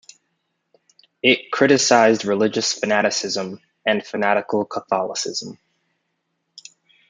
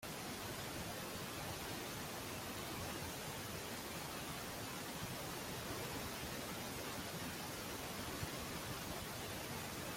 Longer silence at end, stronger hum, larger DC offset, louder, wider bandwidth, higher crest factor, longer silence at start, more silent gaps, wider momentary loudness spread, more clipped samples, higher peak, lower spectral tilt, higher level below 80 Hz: first, 1.55 s vs 0 s; neither; neither; first, -19 LUFS vs -45 LUFS; second, 9.6 kHz vs 16.5 kHz; about the same, 20 dB vs 16 dB; first, 1.25 s vs 0 s; neither; first, 11 LU vs 1 LU; neither; first, -2 dBFS vs -30 dBFS; about the same, -3 dB/octave vs -3 dB/octave; second, -70 dBFS vs -62 dBFS